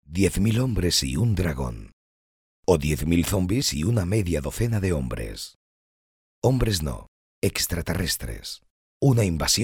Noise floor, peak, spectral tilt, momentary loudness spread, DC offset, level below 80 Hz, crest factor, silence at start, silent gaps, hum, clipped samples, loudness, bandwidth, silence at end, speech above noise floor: under -90 dBFS; -6 dBFS; -5 dB/octave; 12 LU; under 0.1%; -36 dBFS; 18 dB; 0.1 s; 1.93-2.63 s, 5.55-6.42 s, 7.08-7.42 s, 8.70-9.00 s; none; under 0.1%; -24 LUFS; 20 kHz; 0 s; over 67 dB